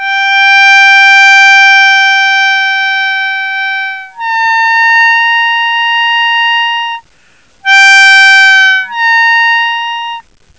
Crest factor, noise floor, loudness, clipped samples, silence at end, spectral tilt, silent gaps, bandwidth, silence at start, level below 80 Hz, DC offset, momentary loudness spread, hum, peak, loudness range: 8 dB; -47 dBFS; -5 LUFS; 2%; 0.4 s; 4.5 dB/octave; none; 8 kHz; 0 s; -60 dBFS; 0.4%; 13 LU; none; 0 dBFS; 5 LU